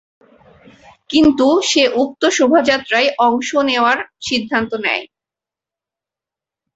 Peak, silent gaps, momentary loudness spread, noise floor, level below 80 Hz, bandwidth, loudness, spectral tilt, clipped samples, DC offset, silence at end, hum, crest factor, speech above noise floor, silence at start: -2 dBFS; none; 7 LU; -88 dBFS; -52 dBFS; 8.2 kHz; -15 LUFS; -2.5 dB/octave; under 0.1%; under 0.1%; 1.7 s; none; 16 dB; 73 dB; 1.1 s